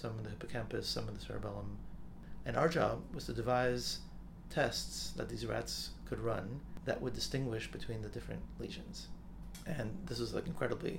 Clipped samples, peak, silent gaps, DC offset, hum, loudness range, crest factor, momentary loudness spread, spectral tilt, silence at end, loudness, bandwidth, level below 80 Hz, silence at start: under 0.1%; -18 dBFS; none; under 0.1%; none; 6 LU; 22 dB; 15 LU; -5 dB/octave; 0 s; -39 LUFS; 17.5 kHz; -52 dBFS; 0 s